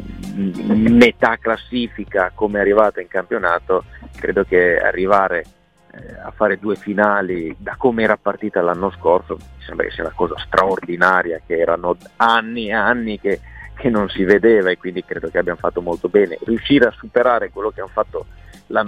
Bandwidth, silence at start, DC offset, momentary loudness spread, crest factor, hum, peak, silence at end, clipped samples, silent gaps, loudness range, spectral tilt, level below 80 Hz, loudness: 12 kHz; 0 s; under 0.1%; 10 LU; 18 dB; none; 0 dBFS; 0 s; under 0.1%; none; 3 LU; -6.5 dB/octave; -42 dBFS; -17 LUFS